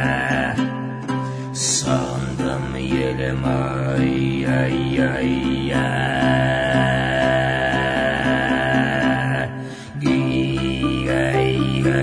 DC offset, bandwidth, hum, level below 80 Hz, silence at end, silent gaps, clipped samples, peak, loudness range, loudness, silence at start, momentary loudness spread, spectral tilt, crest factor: under 0.1%; 10.5 kHz; none; -38 dBFS; 0 s; none; under 0.1%; -4 dBFS; 3 LU; -20 LUFS; 0 s; 7 LU; -5 dB/octave; 16 dB